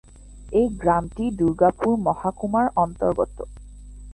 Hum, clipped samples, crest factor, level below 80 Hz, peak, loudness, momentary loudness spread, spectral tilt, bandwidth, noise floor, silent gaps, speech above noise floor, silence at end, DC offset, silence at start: none; under 0.1%; 18 dB; -42 dBFS; -4 dBFS; -22 LUFS; 8 LU; -8 dB/octave; 11 kHz; -41 dBFS; none; 20 dB; 0 s; under 0.1%; 0.25 s